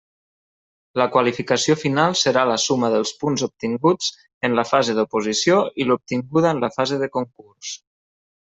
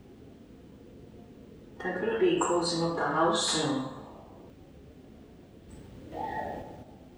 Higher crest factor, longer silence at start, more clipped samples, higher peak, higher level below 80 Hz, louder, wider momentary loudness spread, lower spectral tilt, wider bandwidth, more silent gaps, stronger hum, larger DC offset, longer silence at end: about the same, 18 dB vs 20 dB; first, 0.95 s vs 0.05 s; neither; first, -2 dBFS vs -14 dBFS; about the same, -62 dBFS vs -58 dBFS; first, -20 LUFS vs -29 LUFS; second, 10 LU vs 26 LU; about the same, -4 dB/octave vs -4 dB/octave; second, 8.4 kHz vs over 20 kHz; first, 4.34-4.41 s vs none; neither; neither; first, 0.7 s vs 0 s